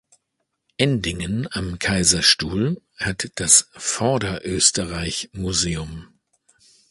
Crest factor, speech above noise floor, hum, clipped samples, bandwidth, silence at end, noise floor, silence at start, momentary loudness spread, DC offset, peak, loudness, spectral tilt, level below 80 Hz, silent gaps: 22 dB; 55 dB; none; under 0.1%; 11.5 kHz; 0.85 s; -76 dBFS; 0.8 s; 13 LU; under 0.1%; 0 dBFS; -20 LUFS; -2.5 dB/octave; -42 dBFS; none